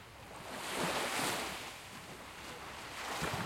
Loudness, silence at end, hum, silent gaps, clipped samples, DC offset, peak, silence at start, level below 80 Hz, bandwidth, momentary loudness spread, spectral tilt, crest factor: -39 LUFS; 0 s; none; none; under 0.1%; under 0.1%; -22 dBFS; 0 s; -62 dBFS; 16.5 kHz; 13 LU; -2.5 dB/octave; 18 dB